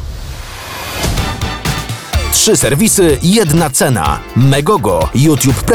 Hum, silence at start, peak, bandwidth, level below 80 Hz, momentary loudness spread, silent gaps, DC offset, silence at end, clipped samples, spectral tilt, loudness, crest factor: none; 0 s; -2 dBFS; over 20 kHz; -24 dBFS; 14 LU; none; under 0.1%; 0 s; under 0.1%; -4.5 dB/octave; -12 LUFS; 10 dB